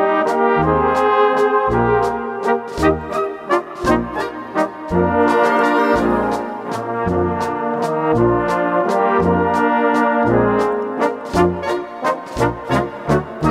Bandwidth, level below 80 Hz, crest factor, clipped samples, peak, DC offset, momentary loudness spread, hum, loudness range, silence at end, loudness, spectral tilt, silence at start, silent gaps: 15 kHz; -38 dBFS; 16 dB; under 0.1%; 0 dBFS; under 0.1%; 7 LU; none; 3 LU; 0 s; -17 LUFS; -7 dB/octave; 0 s; none